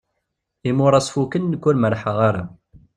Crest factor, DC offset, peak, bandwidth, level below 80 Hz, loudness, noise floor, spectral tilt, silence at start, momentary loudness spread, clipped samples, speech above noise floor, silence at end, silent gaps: 18 dB; under 0.1%; -2 dBFS; 11.5 kHz; -54 dBFS; -19 LUFS; -77 dBFS; -6.5 dB/octave; 0.65 s; 12 LU; under 0.1%; 58 dB; 0.5 s; none